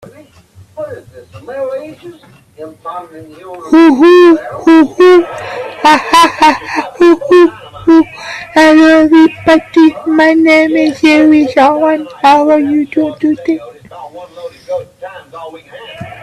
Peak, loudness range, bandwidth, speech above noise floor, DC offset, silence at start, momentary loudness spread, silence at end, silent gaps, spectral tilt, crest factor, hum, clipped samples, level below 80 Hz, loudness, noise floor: 0 dBFS; 11 LU; 12.5 kHz; 32 dB; under 0.1%; 0.75 s; 23 LU; 0.1 s; none; -4.5 dB/octave; 10 dB; none; under 0.1%; -50 dBFS; -8 LUFS; -41 dBFS